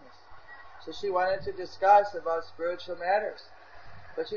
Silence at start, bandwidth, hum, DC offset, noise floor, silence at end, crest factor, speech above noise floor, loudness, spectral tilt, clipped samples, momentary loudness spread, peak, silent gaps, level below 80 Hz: 0 s; 7 kHz; none; 0.5%; -51 dBFS; 0 s; 20 dB; 24 dB; -28 LUFS; -4.5 dB/octave; under 0.1%; 23 LU; -8 dBFS; none; -62 dBFS